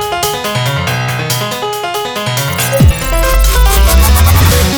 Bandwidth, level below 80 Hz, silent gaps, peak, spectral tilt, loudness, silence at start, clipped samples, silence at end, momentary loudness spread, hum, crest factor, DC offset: over 20 kHz; -14 dBFS; none; 0 dBFS; -4 dB/octave; -11 LUFS; 0 s; under 0.1%; 0 s; 8 LU; none; 10 dB; under 0.1%